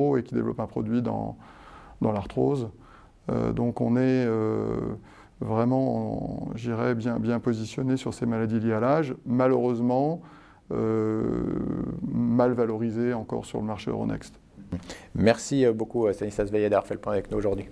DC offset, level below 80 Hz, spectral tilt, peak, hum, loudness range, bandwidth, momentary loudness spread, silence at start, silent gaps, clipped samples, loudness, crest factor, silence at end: under 0.1%; -50 dBFS; -7.5 dB/octave; -6 dBFS; none; 3 LU; 11 kHz; 10 LU; 0 s; none; under 0.1%; -27 LUFS; 22 dB; 0 s